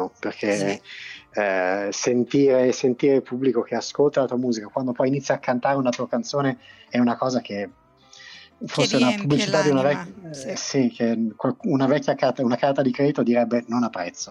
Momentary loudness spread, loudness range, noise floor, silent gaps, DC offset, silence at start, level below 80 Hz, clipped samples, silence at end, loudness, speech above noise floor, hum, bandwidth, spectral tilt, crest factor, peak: 12 LU; 3 LU; -48 dBFS; none; under 0.1%; 0 s; -68 dBFS; under 0.1%; 0 s; -22 LUFS; 26 dB; none; 11 kHz; -5 dB/octave; 16 dB; -6 dBFS